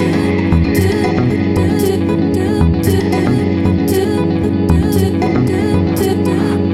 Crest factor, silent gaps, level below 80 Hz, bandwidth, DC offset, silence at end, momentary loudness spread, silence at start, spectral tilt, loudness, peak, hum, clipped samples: 12 dB; none; -28 dBFS; 15.5 kHz; under 0.1%; 0 s; 2 LU; 0 s; -7 dB/octave; -14 LUFS; 0 dBFS; none; under 0.1%